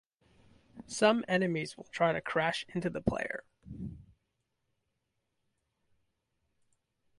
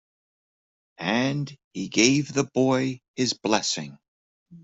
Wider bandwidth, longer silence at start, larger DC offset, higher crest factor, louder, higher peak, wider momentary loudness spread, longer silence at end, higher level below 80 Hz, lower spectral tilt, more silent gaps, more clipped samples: first, 11.5 kHz vs 8.2 kHz; second, 0.75 s vs 1 s; neither; about the same, 22 dB vs 22 dB; second, -32 LUFS vs -24 LUFS; second, -14 dBFS vs -4 dBFS; first, 17 LU vs 12 LU; first, 3.15 s vs 0.05 s; about the same, -60 dBFS vs -64 dBFS; about the same, -5 dB/octave vs -4 dB/octave; second, none vs 1.64-1.71 s, 3.08-3.14 s, 4.08-4.46 s; neither